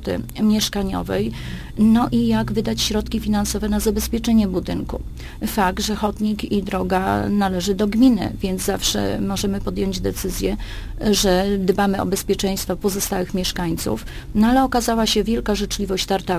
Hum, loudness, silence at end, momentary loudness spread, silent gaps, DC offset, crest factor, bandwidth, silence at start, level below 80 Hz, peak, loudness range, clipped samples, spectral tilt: none; -20 LUFS; 0 s; 8 LU; none; under 0.1%; 16 dB; 15.5 kHz; 0 s; -32 dBFS; -4 dBFS; 2 LU; under 0.1%; -4.5 dB/octave